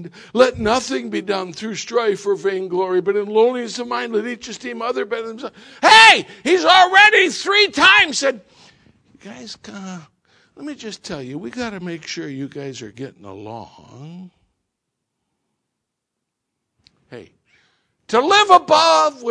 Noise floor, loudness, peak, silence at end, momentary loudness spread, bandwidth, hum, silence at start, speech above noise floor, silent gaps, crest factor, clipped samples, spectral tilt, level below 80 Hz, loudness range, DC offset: -79 dBFS; -14 LUFS; 0 dBFS; 0 s; 24 LU; 11 kHz; none; 0 s; 62 dB; none; 18 dB; under 0.1%; -2.5 dB/octave; -56 dBFS; 21 LU; under 0.1%